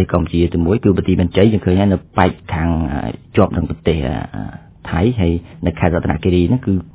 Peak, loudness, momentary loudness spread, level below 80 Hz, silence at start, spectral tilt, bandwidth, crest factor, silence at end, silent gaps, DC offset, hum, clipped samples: 0 dBFS; -16 LUFS; 9 LU; -28 dBFS; 0 s; -12 dB/octave; 4 kHz; 16 dB; 0.05 s; none; under 0.1%; none; under 0.1%